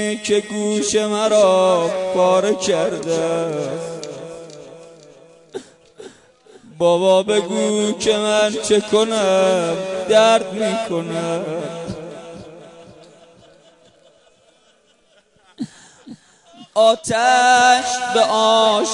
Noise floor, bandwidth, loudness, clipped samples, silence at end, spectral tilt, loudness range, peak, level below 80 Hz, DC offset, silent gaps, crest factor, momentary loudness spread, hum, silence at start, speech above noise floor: -57 dBFS; 11 kHz; -17 LUFS; under 0.1%; 0 s; -3.5 dB/octave; 13 LU; -2 dBFS; -60 dBFS; under 0.1%; none; 16 dB; 19 LU; none; 0 s; 40 dB